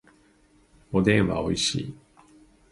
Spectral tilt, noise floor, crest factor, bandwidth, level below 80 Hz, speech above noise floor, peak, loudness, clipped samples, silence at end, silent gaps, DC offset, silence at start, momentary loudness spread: -5 dB/octave; -60 dBFS; 22 dB; 11.5 kHz; -48 dBFS; 36 dB; -6 dBFS; -24 LUFS; under 0.1%; 0.75 s; none; under 0.1%; 0.9 s; 11 LU